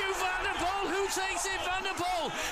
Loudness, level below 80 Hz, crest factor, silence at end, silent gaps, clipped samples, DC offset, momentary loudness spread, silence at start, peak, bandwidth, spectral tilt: -31 LUFS; -50 dBFS; 12 dB; 0 s; none; under 0.1%; under 0.1%; 1 LU; 0 s; -20 dBFS; 15 kHz; -1.5 dB/octave